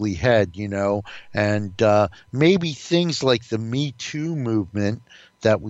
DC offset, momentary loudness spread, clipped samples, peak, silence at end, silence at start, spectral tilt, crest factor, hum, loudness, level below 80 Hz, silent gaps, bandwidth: under 0.1%; 9 LU; under 0.1%; -4 dBFS; 0 s; 0 s; -6 dB/octave; 18 dB; none; -22 LUFS; -50 dBFS; none; 8.2 kHz